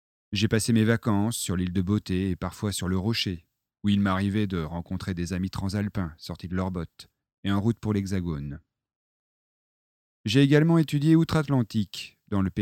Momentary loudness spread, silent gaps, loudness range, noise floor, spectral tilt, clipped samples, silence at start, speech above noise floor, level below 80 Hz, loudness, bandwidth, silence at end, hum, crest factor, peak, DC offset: 13 LU; 7.33-7.43 s, 8.96-10.24 s; 7 LU; under -90 dBFS; -6 dB/octave; under 0.1%; 0.3 s; over 65 dB; -50 dBFS; -26 LUFS; 16.5 kHz; 0 s; none; 20 dB; -6 dBFS; under 0.1%